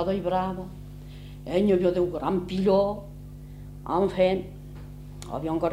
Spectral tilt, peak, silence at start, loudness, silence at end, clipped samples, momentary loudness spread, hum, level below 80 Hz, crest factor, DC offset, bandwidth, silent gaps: -7.5 dB/octave; -10 dBFS; 0 s; -26 LUFS; 0 s; under 0.1%; 20 LU; 50 Hz at -45 dBFS; -46 dBFS; 16 dB; under 0.1%; 15.5 kHz; none